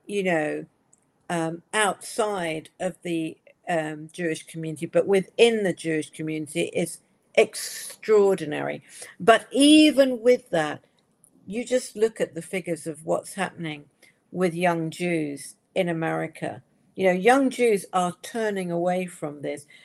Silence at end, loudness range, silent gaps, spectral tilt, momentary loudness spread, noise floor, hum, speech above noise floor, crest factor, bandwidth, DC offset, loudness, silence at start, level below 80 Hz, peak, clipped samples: 0.2 s; 8 LU; none; -4.5 dB/octave; 15 LU; -64 dBFS; none; 40 dB; 22 dB; 15 kHz; under 0.1%; -24 LUFS; 0.1 s; -72 dBFS; -2 dBFS; under 0.1%